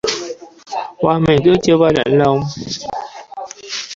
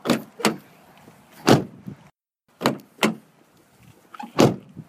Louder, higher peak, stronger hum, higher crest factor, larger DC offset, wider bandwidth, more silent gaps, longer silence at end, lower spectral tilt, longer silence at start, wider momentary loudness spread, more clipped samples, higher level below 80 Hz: first, -15 LUFS vs -22 LUFS; about the same, 0 dBFS vs 0 dBFS; neither; second, 16 dB vs 24 dB; neither; second, 7.8 kHz vs 16 kHz; neither; about the same, 0 s vs 0.05 s; about the same, -5.5 dB/octave vs -5 dB/octave; about the same, 0.05 s vs 0.05 s; about the same, 18 LU vs 20 LU; neither; first, -44 dBFS vs -58 dBFS